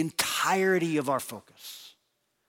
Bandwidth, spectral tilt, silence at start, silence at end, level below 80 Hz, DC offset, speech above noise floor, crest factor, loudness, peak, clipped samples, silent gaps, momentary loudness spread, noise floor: 17 kHz; -3.5 dB/octave; 0 s; 0.6 s; -72 dBFS; under 0.1%; 48 dB; 18 dB; -26 LUFS; -12 dBFS; under 0.1%; none; 19 LU; -76 dBFS